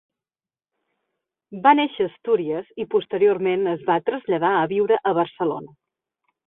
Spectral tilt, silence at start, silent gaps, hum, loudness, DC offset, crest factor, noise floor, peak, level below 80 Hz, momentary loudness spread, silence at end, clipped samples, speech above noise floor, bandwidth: -10.5 dB/octave; 1.5 s; none; none; -21 LUFS; under 0.1%; 20 dB; under -90 dBFS; -2 dBFS; -68 dBFS; 9 LU; 0.8 s; under 0.1%; over 69 dB; 4 kHz